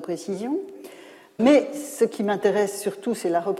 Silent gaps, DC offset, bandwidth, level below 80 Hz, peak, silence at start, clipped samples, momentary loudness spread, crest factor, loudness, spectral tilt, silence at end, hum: none; under 0.1%; 15.5 kHz; -70 dBFS; -6 dBFS; 0 s; under 0.1%; 21 LU; 18 dB; -23 LUFS; -5 dB/octave; 0 s; none